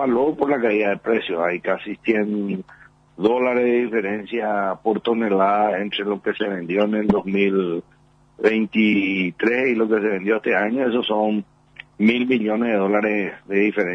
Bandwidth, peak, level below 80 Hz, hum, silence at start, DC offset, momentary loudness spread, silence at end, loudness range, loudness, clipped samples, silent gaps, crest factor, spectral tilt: 6.2 kHz; -4 dBFS; -58 dBFS; none; 0 s; under 0.1%; 6 LU; 0 s; 2 LU; -21 LUFS; under 0.1%; none; 16 dB; -7.5 dB/octave